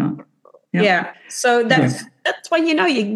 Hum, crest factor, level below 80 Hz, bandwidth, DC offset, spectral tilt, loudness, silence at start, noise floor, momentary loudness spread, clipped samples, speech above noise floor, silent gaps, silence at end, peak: none; 16 dB; -72 dBFS; 12.5 kHz; under 0.1%; -4.5 dB/octave; -18 LUFS; 0 s; -52 dBFS; 10 LU; under 0.1%; 35 dB; none; 0 s; -2 dBFS